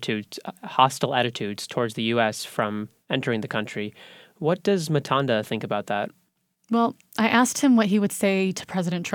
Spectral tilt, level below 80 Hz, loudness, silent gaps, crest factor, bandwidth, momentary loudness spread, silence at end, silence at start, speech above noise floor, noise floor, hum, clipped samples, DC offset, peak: -5 dB/octave; -70 dBFS; -24 LUFS; none; 20 dB; 19 kHz; 10 LU; 0 s; 0 s; 46 dB; -70 dBFS; none; under 0.1%; under 0.1%; -4 dBFS